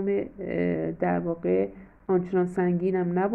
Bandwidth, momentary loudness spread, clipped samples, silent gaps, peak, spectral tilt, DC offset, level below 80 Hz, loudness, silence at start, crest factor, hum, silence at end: 3.3 kHz; 5 LU; under 0.1%; none; -12 dBFS; -10 dB/octave; under 0.1%; -56 dBFS; -27 LUFS; 0 s; 14 dB; none; 0 s